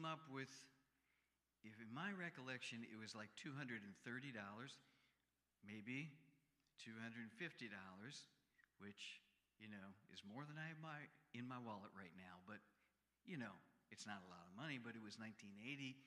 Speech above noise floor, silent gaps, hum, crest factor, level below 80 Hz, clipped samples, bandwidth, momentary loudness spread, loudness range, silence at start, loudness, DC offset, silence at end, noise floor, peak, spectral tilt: 34 dB; none; 60 Hz at -85 dBFS; 22 dB; under -90 dBFS; under 0.1%; 11.5 kHz; 11 LU; 5 LU; 0 s; -55 LUFS; under 0.1%; 0 s; -90 dBFS; -36 dBFS; -4.5 dB/octave